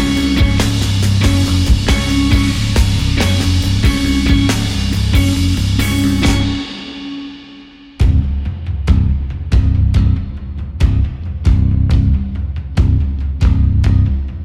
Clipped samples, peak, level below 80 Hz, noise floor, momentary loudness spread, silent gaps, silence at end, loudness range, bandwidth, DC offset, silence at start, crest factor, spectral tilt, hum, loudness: under 0.1%; -2 dBFS; -18 dBFS; -37 dBFS; 9 LU; none; 0 s; 4 LU; 16 kHz; under 0.1%; 0 s; 12 dB; -5.5 dB/octave; none; -15 LUFS